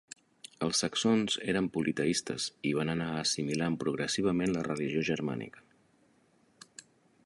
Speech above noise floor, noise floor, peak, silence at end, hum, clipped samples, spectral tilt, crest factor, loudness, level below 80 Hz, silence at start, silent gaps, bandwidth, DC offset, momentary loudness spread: 36 dB; -68 dBFS; -16 dBFS; 1.65 s; none; under 0.1%; -4 dB/octave; 18 dB; -31 LUFS; -64 dBFS; 0.6 s; none; 11.5 kHz; under 0.1%; 20 LU